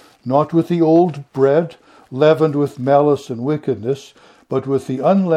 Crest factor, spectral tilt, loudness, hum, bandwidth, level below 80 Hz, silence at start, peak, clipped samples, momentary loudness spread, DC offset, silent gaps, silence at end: 16 dB; -8.5 dB/octave; -17 LUFS; none; 11 kHz; -64 dBFS; 0.25 s; 0 dBFS; under 0.1%; 10 LU; under 0.1%; none; 0 s